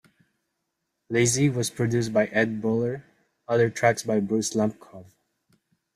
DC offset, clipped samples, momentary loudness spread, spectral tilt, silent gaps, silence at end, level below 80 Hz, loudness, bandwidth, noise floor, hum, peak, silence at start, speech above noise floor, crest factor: under 0.1%; under 0.1%; 7 LU; -5 dB/octave; none; 0.9 s; -62 dBFS; -24 LUFS; 15.5 kHz; -79 dBFS; none; -6 dBFS; 1.1 s; 55 dB; 20 dB